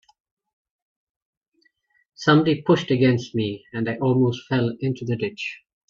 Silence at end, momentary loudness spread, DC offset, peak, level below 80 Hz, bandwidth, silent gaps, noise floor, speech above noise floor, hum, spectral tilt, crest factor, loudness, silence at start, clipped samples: 0.35 s; 10 LU; under 0.1%; -4 dBFS; -62 dBFS; 7.4 kHz; none; -67 dBFS; 45 dB; none; -7 dB/octave; 20 dB; -22 LUFS; 2.2 s; under 0.1%